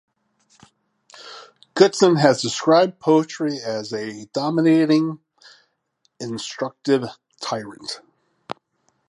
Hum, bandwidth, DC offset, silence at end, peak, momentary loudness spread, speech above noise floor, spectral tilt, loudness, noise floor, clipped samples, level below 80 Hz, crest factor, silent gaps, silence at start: none; 11.5 kHz; under 0.1%; 0.55 s; 0 dBFS; 21 LU; 49 dB; -5 dB/octave; -20 LUFS; -69 dBFS; under 0.1%; -70 dBFS; 22 dB; none; 1.2 s